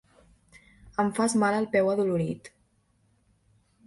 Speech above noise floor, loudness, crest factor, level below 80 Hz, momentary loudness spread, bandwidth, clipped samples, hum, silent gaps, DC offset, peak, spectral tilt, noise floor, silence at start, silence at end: 43 dB; -26 LUFS; 16 dB; -62 dBFS; 10 LU; 11.5 kHz; under 0.1%; none; none; under 0.1%; -12 dBFS; -5.5 dB/octave; -68 dBFS; 0.85 s; 1.4 s